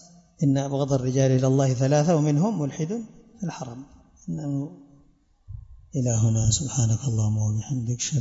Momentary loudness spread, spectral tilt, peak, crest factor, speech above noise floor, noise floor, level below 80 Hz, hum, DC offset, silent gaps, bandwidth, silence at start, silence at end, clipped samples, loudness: 17 LU; -6 dB/octave; -8 dBFS; 16 dB; 36 dB; -59 dBFS; -48 dBFS; none; under 0.1%; none; 8 kHz; 0.4 s; 0 s; under 0.1%; -24 LUFS